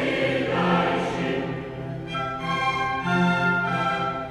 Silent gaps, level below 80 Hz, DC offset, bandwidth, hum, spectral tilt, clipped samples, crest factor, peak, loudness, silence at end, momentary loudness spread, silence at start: none; -50 dBFS; under 0.1%; 11.5 kHz; none; -6 dB/octave; under 0.1%; 16 dB; -10 dBFS; -24 LUFS; 0 s; 9 LU; 0 s